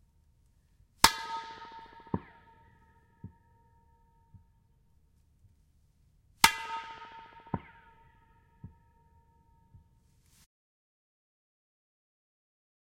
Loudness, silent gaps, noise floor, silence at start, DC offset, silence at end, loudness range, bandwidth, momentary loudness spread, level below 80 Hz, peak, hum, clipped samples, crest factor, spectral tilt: -30 LUFS; none; -67 dBFS; 1.05 s; under 0.1%; 4.25 s; 15 LU; 16 kHz; 30 LU; -62 dBFS; -2 dBFS; none; under 0.1%; 36 dB; -1.5 dB/octave